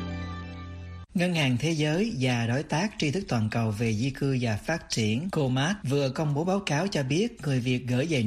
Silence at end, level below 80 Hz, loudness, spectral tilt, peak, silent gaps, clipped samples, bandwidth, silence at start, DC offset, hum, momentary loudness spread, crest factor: 0 s; -52 dBFS; -27 LUFS; -5.5 dB/octave; -12 dBFS; none; under 0.1%; 14 kHz; 0 s; under 0.1%; none; 8 LU; 14 dB